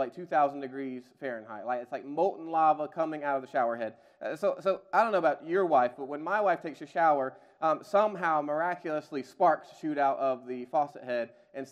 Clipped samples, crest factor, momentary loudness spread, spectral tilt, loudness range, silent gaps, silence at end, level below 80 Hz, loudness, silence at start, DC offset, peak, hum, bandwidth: under 0.1%; 18 dB; 12 LU; -6.5 dB/octave; 3 LU; none; 0 s; -86 dBFS; -30 LUFS; 0 s; under 0.1%; -10 dBFS; none; 11 kHz